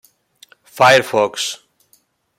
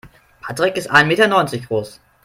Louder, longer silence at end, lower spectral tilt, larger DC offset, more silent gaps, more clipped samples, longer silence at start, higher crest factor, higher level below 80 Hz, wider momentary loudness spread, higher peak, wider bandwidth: about the same, -14 LUFS vs -16 LUFS; first, 0.85 s vs 0.3 s; second, -2.5 dB/octave vs -4.5 dB/octave; neither; neither; neither; first, 0.75 s vs 0.05 s; about the same, 18 dB vs 18 dB; second, -64 dBFS vs -54 dBFS; second, 13 LU vs 18 LU; about the same, 0 dBFS vs 0 dBFS; about the same, 16.5 kHz vs 16.5 kHz